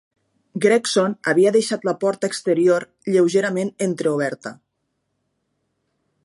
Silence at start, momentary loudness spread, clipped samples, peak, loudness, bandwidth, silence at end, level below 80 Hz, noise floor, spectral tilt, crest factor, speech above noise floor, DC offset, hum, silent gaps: 0.55 s; 7 LU; under 0.1%; -4 dBFS; -19 LUFS; 11.5 kHz; 1.7 s; -74 dBFS; -74 dBFS; -5 dB/octave; 18 dB; 55 dB; under 0.1%; none; none